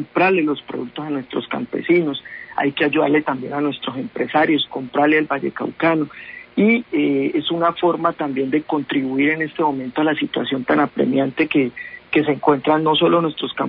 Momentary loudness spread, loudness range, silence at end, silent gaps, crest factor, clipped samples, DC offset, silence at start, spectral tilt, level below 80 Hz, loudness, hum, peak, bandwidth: 9 LU; 2 LU; 0 s; none; 16 dB; under 0.1%; under 0.1%; 0 s; -10.5 dB/octave; -60 dBFS; -19 LUFS; none; -4 dBFS; 5.2 kHz